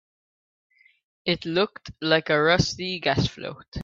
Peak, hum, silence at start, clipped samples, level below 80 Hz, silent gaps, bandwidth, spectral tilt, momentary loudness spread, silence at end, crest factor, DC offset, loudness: -6 dBFS; none; 1.25 s; under 0.1%; -48 dBFS; 3.68-3.72 s; 7.8 kHz; -4.5 dB/octave; 11 LU; 0 s; 20 dB; under 0.1%; -24 LUFS